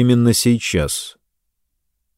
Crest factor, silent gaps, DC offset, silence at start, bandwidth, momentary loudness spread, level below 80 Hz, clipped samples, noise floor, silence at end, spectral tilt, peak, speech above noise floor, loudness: 16 dB; none; under 0.1%; 0 s; 16.5 kHz; 11 LU; -40 dBFS; under 0.1%; -72 dBFS; 1.05 s; -5 dB/octave; -2 dBFS; 57 dB; -17 LUFS